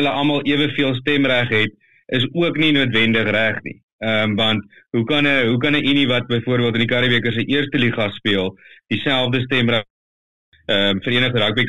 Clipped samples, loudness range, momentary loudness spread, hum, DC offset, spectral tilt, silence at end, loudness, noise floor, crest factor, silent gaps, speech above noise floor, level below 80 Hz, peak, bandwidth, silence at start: under 0.1%; 3 LU; 7 LU; none; 1%; -6.5 dB/octave; 0 s; -18 LUFS; under -90 dBFS; 14 dB; 3.83-3.99 s, 9.90-10.52 s; over 72 dB; -52 dBFS; -4 dBFS; 11 kHz; 0 s